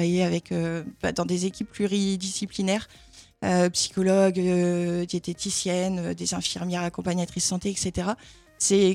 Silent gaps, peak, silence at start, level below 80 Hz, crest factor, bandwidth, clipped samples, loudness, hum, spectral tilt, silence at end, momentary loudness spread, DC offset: none; -8 dBFS; 0 s; -54 dBFS; 16 dB; 13.5 kHz; under 0.1%; -26 LUFS; none; -4.5 dB/octave; 0 s; 8 LU; under 0.1%